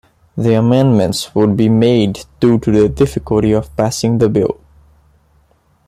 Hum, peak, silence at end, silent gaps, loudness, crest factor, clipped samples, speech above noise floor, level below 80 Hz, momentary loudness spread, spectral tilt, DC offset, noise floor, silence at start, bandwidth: none; 0 dBFS; 1.35 s; none; -13 LUFS; 14 dB; under 0.1%; 42 dB; -38 dBFS; 7 LU; -7 dB/octave; under 0.1%; -54 dBFS; 0.35 s; 14 kHz